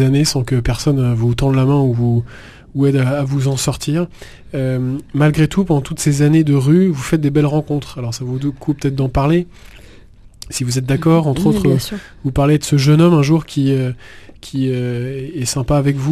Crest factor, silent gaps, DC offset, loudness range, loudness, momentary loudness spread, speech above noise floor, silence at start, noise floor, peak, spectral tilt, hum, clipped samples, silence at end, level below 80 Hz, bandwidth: 14 dB; none; under 0.1%; 4 LU; -16 LUFS; 10 LU; 26 dB; 0 s; -41 dBFS; 0 dBFS; -6.5 dB/octave; none; under 0.1%; 0 s; -36 dBFS; 14 kHz